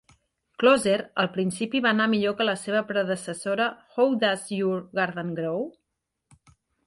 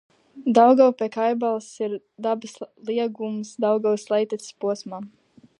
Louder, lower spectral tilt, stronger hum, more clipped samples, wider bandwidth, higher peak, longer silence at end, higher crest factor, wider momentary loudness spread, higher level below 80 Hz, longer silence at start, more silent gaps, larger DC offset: about the same, -25 LUFS vs -23 LUFS; about the same, -4.5 dB/octave vs -5.5 dB/octave; neither; neither; about the same, 12 kHz vs 11.5 kHz; second, -8 dBFS vs -2 dBFS; first, 1.15 s vs 0.55 s; about the same, 18 dB vs 20 dB; second, 8 LU vs 15 LU; first, -68 dBFS vs -80 dBFS; first, 0.6 s vs 0.35 s; neither; neither